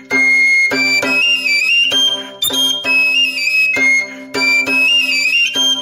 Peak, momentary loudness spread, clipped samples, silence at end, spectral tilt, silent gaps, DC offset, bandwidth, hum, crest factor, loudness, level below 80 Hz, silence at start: -4 dBFS; 4 LU; under 0.1%; 0 s; 0 dB/octave; none; under 0.1%; 16 kHz; none; 10 dB; -11 LUFS; -62 dBFS; 0 s